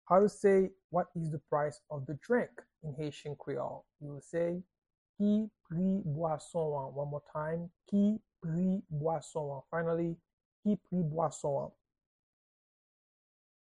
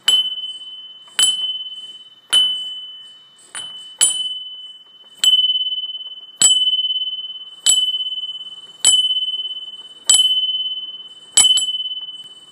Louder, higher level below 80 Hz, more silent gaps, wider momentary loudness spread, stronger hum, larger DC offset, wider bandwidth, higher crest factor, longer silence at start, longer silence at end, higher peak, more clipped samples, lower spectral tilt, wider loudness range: second, -35 LUFS vs -15 LUFS; about the same, -68 dBFS vs -66 dBFS; first, 0.84-0.89 s, 4.78-4.82 s, 4.98-5.14 s, 10.33-10.38 s, 10.45-10.63 s vs none; second, 12 LU vs 20 LU; neither; neither; second, 10.5 kHz vs 15.5 kHz; about the same, 20 dB vs 20 dB; about the same, 0.05 s vs 0.05 s; first, 1.95 s vs 0.1 s; second, -14 dBFS vs 0 dBFS; neither; first, -8 dB/octave vs 3.5 dB/octave; about the same, 4 LU vs 4 LU